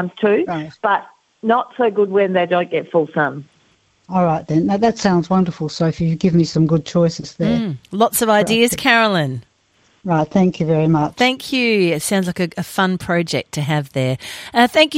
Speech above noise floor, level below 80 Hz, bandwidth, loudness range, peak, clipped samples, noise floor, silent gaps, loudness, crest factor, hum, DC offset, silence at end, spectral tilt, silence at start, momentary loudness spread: 41 dB; -52 dBFS; 16 kHz; 2 LU; 0 dBFS; under 0.1%; -58 dBFS; none; -17 LUFS; 18 dB; none; under 0.1%; 0 s; -5.5 dB/octave; 0 s; 7 LU